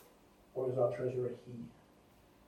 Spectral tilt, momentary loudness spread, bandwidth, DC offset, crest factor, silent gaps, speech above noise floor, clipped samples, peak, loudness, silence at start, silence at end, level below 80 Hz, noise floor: -8.5 dB/octave; 16 LU; 14 kHz; under 0.1%; 20 dB; none; 28 dB; under 0.1%; -20 dBFS; -37 LUFS; 0 s; 0.75 s; -72 dBFS; -64 dBFS